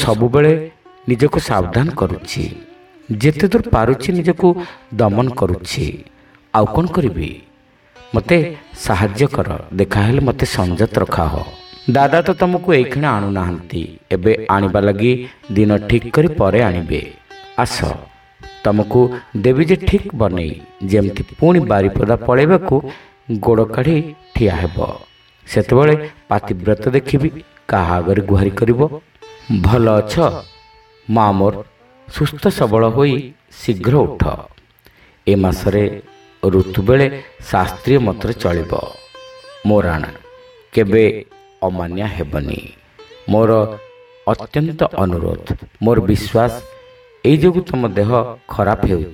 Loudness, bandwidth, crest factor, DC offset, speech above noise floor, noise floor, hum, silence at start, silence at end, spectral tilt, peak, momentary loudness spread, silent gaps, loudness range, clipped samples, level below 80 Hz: -16 LUFS; 16 kHz; 16 dB; under 0.1%; 36 dB; -50 dBFS; none; 0 s; 0 s; -7.5 dB/octave; 0 dBFS; 12 LU; none; 3 LU; under 0.1%; -34 dBFS